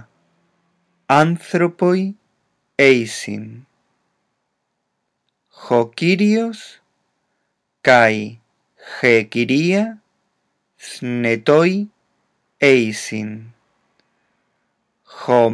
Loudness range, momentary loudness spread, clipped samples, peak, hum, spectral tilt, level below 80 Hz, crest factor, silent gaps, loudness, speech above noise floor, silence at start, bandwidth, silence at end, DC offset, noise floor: 4 LU; 17 LU; under 0.1%; 0 dBFS; none; -5.5 dB/octave; -74 dBFS; 20 dB; none; -17 LUFS; 57 dB; 1.1 s; 11 kHz; 0 s; under 0.1%; -73 dBFS